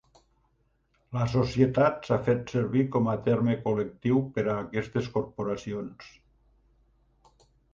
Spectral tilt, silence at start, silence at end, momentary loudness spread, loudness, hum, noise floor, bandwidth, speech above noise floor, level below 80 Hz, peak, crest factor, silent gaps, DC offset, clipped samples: -8 dB/octave; 1.1 s; 1.65 s; 9 LU; -28 LUFS; none; -70 dBFS; 7.4 kHz; 43 dB; -56 dBFS; -8 dBFS; 20 dB; none; under 0.1%; under 0.1%